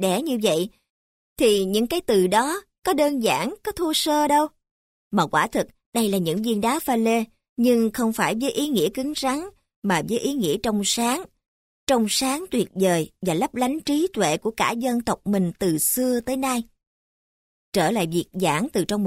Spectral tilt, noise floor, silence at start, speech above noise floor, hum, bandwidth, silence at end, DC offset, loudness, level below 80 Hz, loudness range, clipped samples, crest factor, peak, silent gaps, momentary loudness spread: -4 dB/octave; under -90 dBFS; 0 s; over 68 dB; none; 16 kHz; 0 s; under 0.1%; -23 LUFS; -54 dBFS; 2 LU; under 0.1%; 16 dB; -6 dBFS; 0.90-1.36 s, 4.71-5.11 s, 5.86-5.92 s, 7.49-7.56 s, 9.76-9.82 s, 11.48-11.87 s, 16.87-17.72 s; 7 LU